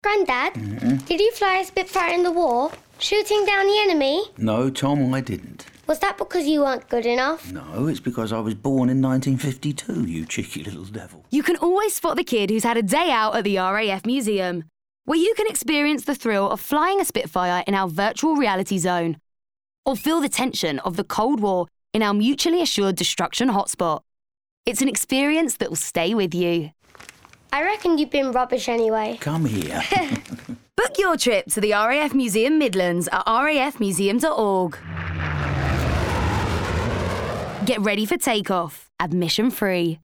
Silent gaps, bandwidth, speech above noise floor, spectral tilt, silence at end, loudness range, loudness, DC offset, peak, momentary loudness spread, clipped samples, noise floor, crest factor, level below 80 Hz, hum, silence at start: 19.78-19.83 s, 24.51-24.63 s; over 20 kHz; 26 dB; -4.5 dB/octave; 0.05 s; 3 LU; -22 LUFS; under 0.1%; -4 dBFS; 8 LU; under 0.1%; -48 dBFS; 18 dB; -44 dBFS; none; 0.05 s